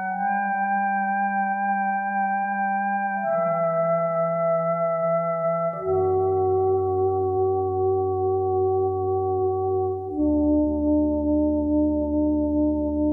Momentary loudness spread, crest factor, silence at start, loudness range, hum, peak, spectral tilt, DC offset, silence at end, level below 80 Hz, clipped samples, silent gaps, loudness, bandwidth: 3 LU; 10 dB; 0 s; 1 LU; none; -12 dBFS; -12.5 dB/octave; under 0.1%; 0 s; -42 dBFS; under 0.1%; none; -23 LUFS; 2.6 kHz